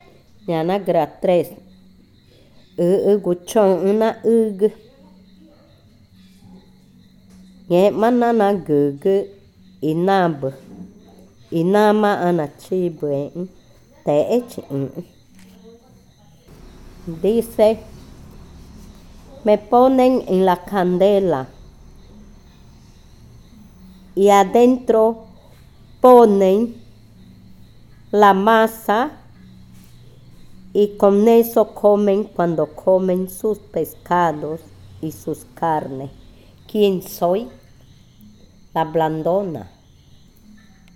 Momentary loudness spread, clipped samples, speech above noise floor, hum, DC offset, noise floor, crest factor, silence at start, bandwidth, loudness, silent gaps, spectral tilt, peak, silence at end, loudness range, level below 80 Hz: 16 LU; under 0.1%; 34 dB; none; under 0.1%; -50 dBFS; 20 dB; 0.5 s; 18 kHz; -17 LUFS; none; -6.5 dB/octave; 0 dBFS; 1.3 s; 8 LU; -50 dBFS